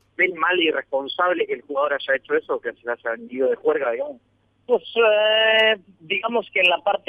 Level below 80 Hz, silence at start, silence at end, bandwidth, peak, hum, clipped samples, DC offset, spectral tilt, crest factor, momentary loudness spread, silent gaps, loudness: -72 dBFS; 0.2 s; 0.1 s; 5 kHz; -6 dBFS; none; under 0.1%; under 0.1%; -4.5 dB/octave; 16 dB; 11 LU; none; -21 LUFS